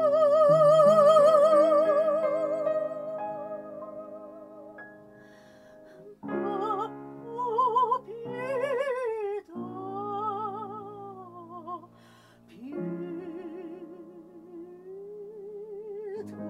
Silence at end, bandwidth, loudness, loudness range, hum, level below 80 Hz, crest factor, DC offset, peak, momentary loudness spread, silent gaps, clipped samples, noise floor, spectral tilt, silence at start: 0 s; 11 kHz; -25 LUFS; 18 LU; none; -76 dBFS; 18 dB; under 0.1%; -8 dBFS; 25 LU; none; under 0.1%; -56 dBFS; -6.5 dB/octave; 0 s